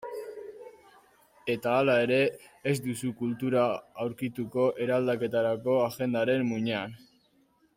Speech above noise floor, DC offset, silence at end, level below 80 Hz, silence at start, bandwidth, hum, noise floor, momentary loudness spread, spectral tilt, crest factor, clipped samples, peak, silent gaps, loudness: 39 dB; under 0.1%; 0.8 s; -70 dBFS; 0 s; 16 kHz; none; -67 dBFS; 15 LU; -6 dB/octave; 16 dB; under 0.1%; -12 dBFS; none; -28 LUFS